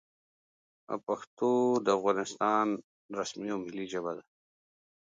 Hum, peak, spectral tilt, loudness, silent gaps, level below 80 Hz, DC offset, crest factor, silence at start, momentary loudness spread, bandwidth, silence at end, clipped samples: none; -14 dBFS; -5 dB/octave; -32 LUFS; 1.27-1.37 s, 2.84-3.09 s; -78 dBFS; under 0.1%; 18 dB; 0.9 s; 12 LU; 9.2 kHz; 0.8 s; under 0.1%